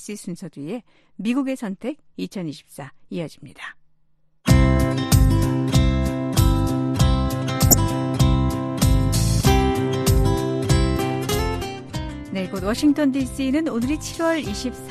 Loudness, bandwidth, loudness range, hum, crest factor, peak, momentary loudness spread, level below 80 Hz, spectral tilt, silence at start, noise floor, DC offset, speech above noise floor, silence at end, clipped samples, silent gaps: -21 LUFS; 14.5 kHz; 10 LU; none; 20 dB; 0 dBFS; 15 LU; -28 dBFS; -5.5 dB/octave; 0 s; -58 dBFS; under 0.1%; 35 dB; 0 s; under 0.1%; none